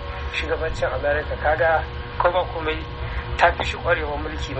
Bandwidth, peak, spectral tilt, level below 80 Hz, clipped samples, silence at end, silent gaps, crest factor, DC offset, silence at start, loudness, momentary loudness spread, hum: 8.4 kHz; -2 dBFS; -5.5 dB/octave; -32 dBFS; under 0.1%; 0 s; none; 20 dB; under 0.1%; 0 s; -23 LUFS; 9 LU; none